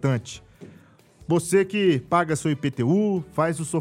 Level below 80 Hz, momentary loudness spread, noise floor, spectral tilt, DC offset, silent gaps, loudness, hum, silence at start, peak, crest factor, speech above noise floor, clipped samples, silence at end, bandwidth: -58 dBFS; 9 LU; -52 dBFS; -6 dB/octave; under 0.1%; none; -23 LUFS; none; 0 s; -6 dBFS; 18 dB; 30 dB; under 0.1%; 0 s; 15.5 kHz